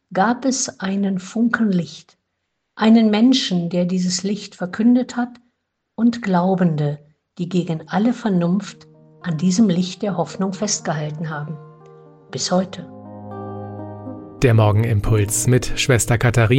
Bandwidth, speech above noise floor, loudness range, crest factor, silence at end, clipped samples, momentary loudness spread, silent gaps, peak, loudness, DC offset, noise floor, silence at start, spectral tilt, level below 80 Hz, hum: 16 kHz; 56 dB; 6 LU; 18 dB; 0 s; under 0.1%; 17 LU; none; -2 dBFS; -19 LUFS; under 0.1%; -74 dBFS; 0.1 s; -5.5 dB/octave; -40 dBFS; none